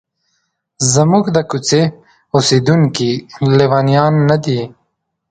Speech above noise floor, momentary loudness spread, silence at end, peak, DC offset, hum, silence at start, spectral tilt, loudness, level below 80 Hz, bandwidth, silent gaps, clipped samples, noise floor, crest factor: 56 dB; 7 LU; 0.65 s; 0 dBFS; under 0.1%; none; 0.8 s; -5.5 dB/octave; -13 LUFS; -50 dBFS; 9.4 kHz; none; under 0.1%; -68 dBFS; 14 dB